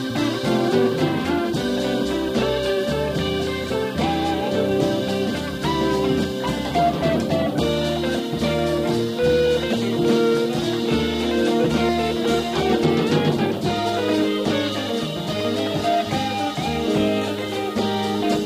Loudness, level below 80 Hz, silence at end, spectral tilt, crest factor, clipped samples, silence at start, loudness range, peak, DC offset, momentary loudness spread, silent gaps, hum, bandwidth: -21 LUFS; -42 dBFS; 0 s; -5.5 dB/octave; 14 dB; under 0.1%; 0 s; 2 LU; -6 dBFS; under 0.1%; 5 LU; none; none; 15.5 kHz